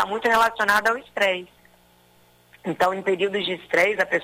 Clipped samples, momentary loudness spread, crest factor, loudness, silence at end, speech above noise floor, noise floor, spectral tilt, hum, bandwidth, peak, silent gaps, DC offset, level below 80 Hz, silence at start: under 0.1%; 8 LU; 18 dB; -22 LUFS; 0 s; 35 dB; -57 dBFS; -3.5 dB/octave; 60 Hz at -60 dBFS; 16 kHz; -6 dBFS; none; under 0.1%; -60 dBFS; 0 s